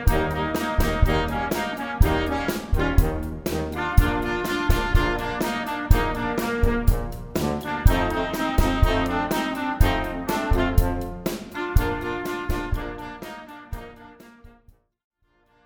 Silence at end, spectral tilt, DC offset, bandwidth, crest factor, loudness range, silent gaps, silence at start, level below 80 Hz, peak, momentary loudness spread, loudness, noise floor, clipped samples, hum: 1.15 s; -6 dB/octave; under 0.1%; over 20 kHz; 22 dB; 6 LU; none; 0 s; -26 dBFS; -2 dBFS; 9 LU; -24 LUFS; -63 dBFS; under 0.1%; none